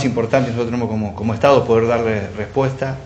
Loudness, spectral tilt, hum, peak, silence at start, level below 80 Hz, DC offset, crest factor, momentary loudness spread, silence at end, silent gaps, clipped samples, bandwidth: -18 LUFS; -7 dB/octave; none; 0 dBFS; 0 s; -46 dBFS; under 0.1%; 18 dB; 8 LU; 0 s; none; under 0.1%; 8.4 kHz